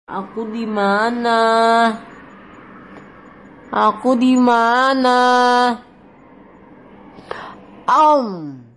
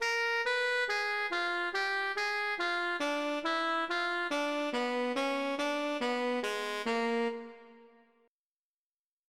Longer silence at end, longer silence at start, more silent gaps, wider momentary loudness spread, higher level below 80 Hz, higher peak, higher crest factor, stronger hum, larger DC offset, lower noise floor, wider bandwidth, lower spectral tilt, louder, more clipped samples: second, 0.15 s vs 1.45 s; about the same, 0.1 s vs 0 s; neither; first, 18 LU vs 3 LU; first, -60 dBFS vs -78 dBFS; first, -2 dBFS vs -22 dBFS; about the same, 16 dB vs 12 dB; neither; neither; second, -45 dBFS vs under -90 dBFS; second, 11 kHz vs 15.5 kHz; first, -4.5 dB/octave vs -2 dB/octave; first, -15 LUFS vs -32 LUFS; neither